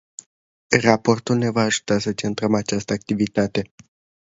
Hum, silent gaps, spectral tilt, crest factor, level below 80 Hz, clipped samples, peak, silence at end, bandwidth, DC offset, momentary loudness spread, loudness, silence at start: none; none; -5 dB/octave; 22 dB; -54 dBFS; under 0.1%; 0 dBFS; 0.6 s; 8 kHz; under 0.1%; 9 LU; -21 LUFS; 0.7 s